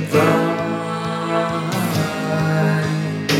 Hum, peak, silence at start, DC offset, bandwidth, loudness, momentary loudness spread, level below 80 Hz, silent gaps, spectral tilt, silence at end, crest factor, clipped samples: none; -4 dBFS; 0 s; under 0.1%; 16 kHz; -19 LUFS; 7 LU; -54 dBFS; none; -6 dB/octave; 0 s; 16 dB; under 0.1%